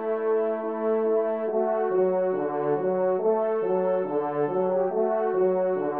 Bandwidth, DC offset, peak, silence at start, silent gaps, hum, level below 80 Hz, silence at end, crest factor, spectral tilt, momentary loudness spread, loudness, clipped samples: 3.5 kHz; 0.1%; -12 dBFS; 0 s; none; none; -78 dBFS; 0 s; 12 dB; -8 dB/octave; 3 LU; -25 LUFS; under 0.1%